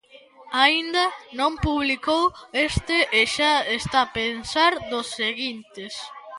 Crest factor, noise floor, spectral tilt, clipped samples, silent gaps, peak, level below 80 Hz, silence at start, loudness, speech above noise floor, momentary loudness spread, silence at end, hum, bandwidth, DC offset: 22 dB; -49 dBFS; -3.5 dB/octave; under 0.1%; none; -2 dBFS; -44 dBFS; 0.15 s; -22 LUFS; 25 dB; 11 LU; 0 s; none; 11.5 kHz; under 0.1%